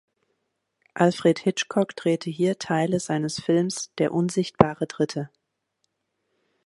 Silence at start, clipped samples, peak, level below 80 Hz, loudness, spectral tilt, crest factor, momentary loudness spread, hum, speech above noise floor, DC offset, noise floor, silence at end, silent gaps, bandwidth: 0.95 s; under 0.1%; 0 dBFS; -58 dBFS; -24 LUFS; -5.5 dB/octave; 24 dB; 6 LU; none; 53 dB; under 0.1%; -77 dBFS; 1.4 s; none; 11.5 kHz